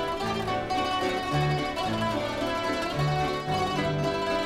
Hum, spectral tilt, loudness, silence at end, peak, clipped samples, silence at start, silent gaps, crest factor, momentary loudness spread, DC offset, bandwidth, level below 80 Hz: none; -5.5 dB/octave; -28 LUFS; 0 s; -14 dBFS; under 0.1%; 0 s; none; 12 dB; 2 LU; under 0.1%; 15.5 kHz; -46 dBFS